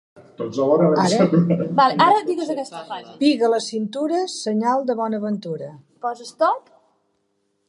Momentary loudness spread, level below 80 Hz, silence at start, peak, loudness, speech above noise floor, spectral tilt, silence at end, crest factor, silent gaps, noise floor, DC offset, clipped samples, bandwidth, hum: 14 LU; -70 dBFS; 0.15 s; -2 dBFS; -20 LUFS; 50 dB; -6 dB/octave; 1.1 s; 18 dB; none; -70 dBFS; under 0.1%; under 0.1%; 11.5 kHz; none